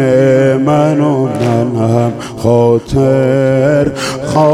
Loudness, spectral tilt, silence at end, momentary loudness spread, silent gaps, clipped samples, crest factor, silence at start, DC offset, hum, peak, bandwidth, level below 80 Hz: -11 LUFS; -7.5 dB/octave; 0 s; 5 LU; none; under 0.1%; 10 dB; 0 s; under 0.1%; none; 0 dBFS; 13.5 kHz; -38 dBFS